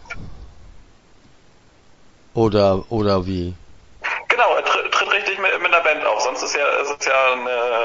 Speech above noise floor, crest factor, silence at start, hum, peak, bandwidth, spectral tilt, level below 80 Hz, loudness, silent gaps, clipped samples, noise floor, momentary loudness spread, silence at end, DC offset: 32 dB; 20 dB; 0 s; none; 0 dBFS; 7.8 kHz; -4 dB/octave; -46 dBFS; -18 LUFS; none; under 0.1%; -50 dBFS; 11 LU; 0 s; under 0.1%